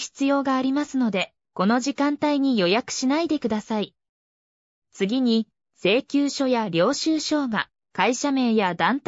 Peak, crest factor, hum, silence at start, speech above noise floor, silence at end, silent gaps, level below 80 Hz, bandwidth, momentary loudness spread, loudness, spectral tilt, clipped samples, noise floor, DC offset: -6 dBFS; 16 dB; none; 0 s; over 68 dB; 0.1 s; 4.09-4.82 s; -68 dBFS; 8 kHz; 7 LU; -23 LUFS; -4.5 dB/octave; under 0.1%; under -90 dBFS; under 0.1%